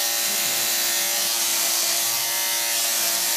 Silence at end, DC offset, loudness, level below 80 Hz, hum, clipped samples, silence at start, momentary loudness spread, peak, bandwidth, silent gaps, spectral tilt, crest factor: 0 s; under 0.1%; -19 LUFS; -82 dBFS; none; under 0.1%; 0 s; 1 LU; -8 dBFS; 16 kHz; none; 2 dB/octave; 16 dB